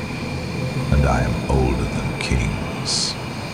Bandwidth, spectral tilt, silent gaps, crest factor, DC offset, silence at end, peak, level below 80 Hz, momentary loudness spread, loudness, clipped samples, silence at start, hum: 15 kHz; -5 dB/octave; none; 16 dB; under 0.1%; 0 s; -6 dBFS; -28 dBFS; 7 LU; -21 LUFS; under 0.1%; 0 s; none